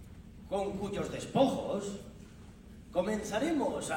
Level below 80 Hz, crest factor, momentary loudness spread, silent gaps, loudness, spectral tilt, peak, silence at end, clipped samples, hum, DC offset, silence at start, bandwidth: -56 dBFS; 20 dB; 23 LU; none; -34 LUFS; -5.5 dB/octave; -14 dBFS; 0 s; under 0.1%; none; under 0.1%; 0 s; 16.5 kHz